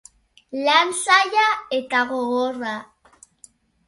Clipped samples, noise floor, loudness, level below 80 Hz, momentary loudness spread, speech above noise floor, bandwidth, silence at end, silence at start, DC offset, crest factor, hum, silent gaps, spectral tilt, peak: under 0.1%; -54 dBFS; -19 LUFS; -66 dBFS; 13 LU; 33 dB; 11.5 kHz; 1.05 s; 0.5 s; under 0.1%; 20 dB; none; none; -1 dB/octave; -2 dBFS